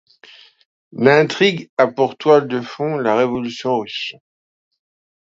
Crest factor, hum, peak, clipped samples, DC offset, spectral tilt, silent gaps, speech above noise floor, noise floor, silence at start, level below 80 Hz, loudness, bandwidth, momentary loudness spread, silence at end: 18 dB; none; 0 dBFS; under 0.1%; under 0.1%; -5.5 dB/octave; 1.69-1.77 s; 29 dB; -46 dBFS; 0.95 s; -64 dBFS; -17 LUFS; 7.8 kHz; 12 LU; 1.2 s